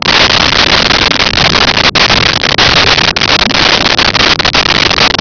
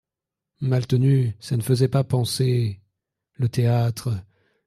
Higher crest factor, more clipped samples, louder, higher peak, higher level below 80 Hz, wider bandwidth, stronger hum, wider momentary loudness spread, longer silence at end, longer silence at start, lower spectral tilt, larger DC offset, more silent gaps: second, 8 dB vs 16 dB; neither; first, -5 LUFS vs -23 LUFS; first, 0 dBFS vs -6 dBFS; first, -26 dBFS vs -56 dBFS; second, 5.4 kHz vs 14 kHz; neither; second, 2 LU vs 9 LU; second, 0 s vs 0.45 s; second, 0 s vs 0.6 s; second, -2.5 dB/octave vs -7 dB/octave; neither; neither